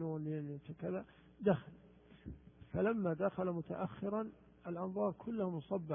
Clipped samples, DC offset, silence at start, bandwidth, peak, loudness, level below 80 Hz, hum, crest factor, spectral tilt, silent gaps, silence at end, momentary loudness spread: under 0.1%; under 0.1%; 0 s; 3.6 kHz; -20 dBFS; -40 LUFS; -66 dBFS; none; 20 dB; -6 dB/octave; none; 0 s; 18 LU